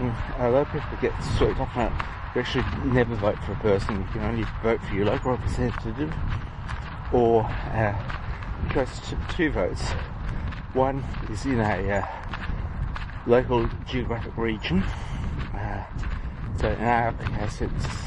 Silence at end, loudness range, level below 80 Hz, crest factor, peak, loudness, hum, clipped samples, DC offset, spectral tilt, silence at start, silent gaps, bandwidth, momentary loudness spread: 0 s; 3 LU; -34 dBFS; 20 dB; -6 dBFS; -27 LUFS; none; under 0.1%; under 0.1%; -7 dB/octave; 0 s; none; 11 kHz; 10 LU